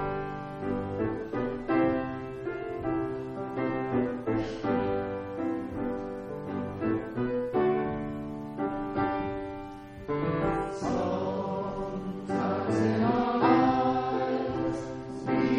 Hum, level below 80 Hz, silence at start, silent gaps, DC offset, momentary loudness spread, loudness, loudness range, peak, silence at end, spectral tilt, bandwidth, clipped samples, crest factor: none; -52 dBFS; 0 s; none; under 0.1%; 10 LU; -30 LUFS; 5 LU; -10 dBFS; 0 s; -8 dB/octave; 9.8 kHz; under 0.1%; 18 dB